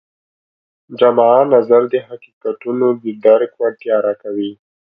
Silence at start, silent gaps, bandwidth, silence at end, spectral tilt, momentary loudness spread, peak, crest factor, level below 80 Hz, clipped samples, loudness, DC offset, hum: 0.9 s; 2.33-2.41 s; 5 kHz; 0.3 s; -9 dB/octave; 14 LU; 0 dBFS; 16 dB; -66 dBFS; under 0.1%; -15 LUFS; under 0.1%; none